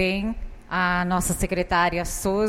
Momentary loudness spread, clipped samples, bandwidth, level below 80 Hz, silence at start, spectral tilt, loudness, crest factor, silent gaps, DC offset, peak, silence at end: 8 LU; under 0.1%; 16.5 kHz; -36 dBFS; 0 s; -4.5 dB/octave; -24 LUFS; 16 dB; none; under 0.1%; -8 dBFS; 0 s